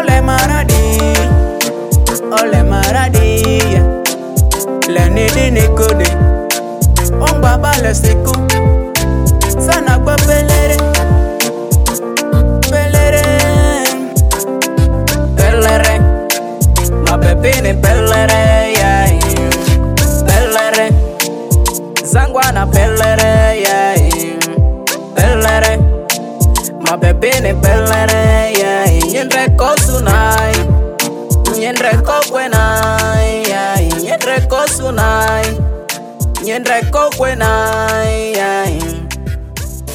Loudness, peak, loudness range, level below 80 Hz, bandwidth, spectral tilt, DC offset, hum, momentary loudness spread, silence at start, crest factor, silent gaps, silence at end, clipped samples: -11 LUFS; 0 dBFS; 3 LU; -16 dBFS; 16.5 kHz; -4.5 dB/octave; under 0.1%; none; 5 LU; 0 s; 10 dB; none; 0 s; under 0.1%